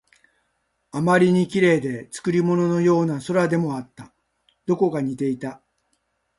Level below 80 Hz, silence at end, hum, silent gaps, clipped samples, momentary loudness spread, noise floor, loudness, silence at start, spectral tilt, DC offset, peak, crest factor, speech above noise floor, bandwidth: -62 dBFS; 0.8 s; none; none; under 0.1%; 14 LU; -72 dBFS; -21 LUFS; 0.95 s; -7 dB/octave; under 0.1%; -4 dBFS; 18 dB; 51 dB; 11.5 kHz